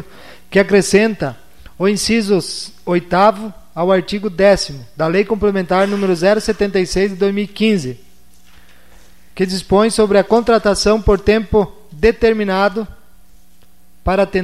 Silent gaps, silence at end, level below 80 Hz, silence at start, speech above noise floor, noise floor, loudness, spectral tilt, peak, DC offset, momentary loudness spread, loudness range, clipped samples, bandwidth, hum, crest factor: none; 0 s; -34 dBFS; 0 s; 38 dB; -52 dBFS; -15 LUFS; -5 dB/octave; 0 dBFS; 1%; 10 LU; 4 LU; under 0.1%; 14.5 kHz; none; 16 dB